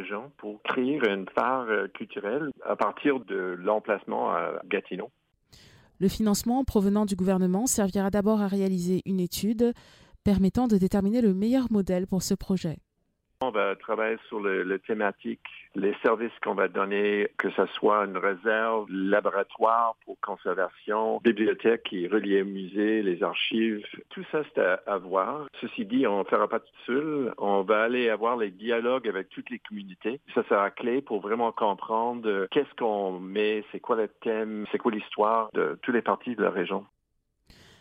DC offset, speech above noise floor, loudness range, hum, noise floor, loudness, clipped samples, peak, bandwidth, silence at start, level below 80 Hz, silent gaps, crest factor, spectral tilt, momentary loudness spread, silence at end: under 0.1%; 48 dB; 3 LU; none; -75 dBFS; -27 LUFS; under 0.1%; -10 dBFS; 16 kHz; 0 s; -54 dBFS; none; 18 dB; -5.5 dB/octave; 9 LU; 0.95 s